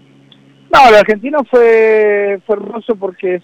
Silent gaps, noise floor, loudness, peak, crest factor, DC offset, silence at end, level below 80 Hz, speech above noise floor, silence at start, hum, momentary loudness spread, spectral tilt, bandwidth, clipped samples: none; -44 dBFS; -10 LUFS; -2 dBFS; 10 dB; under 0.1%; 0.05 s; -44 dBFS; 34 dB; 0.7 s; none; 13 LU; -4.5 dB/octave; 10.5 kHz; under 0.1%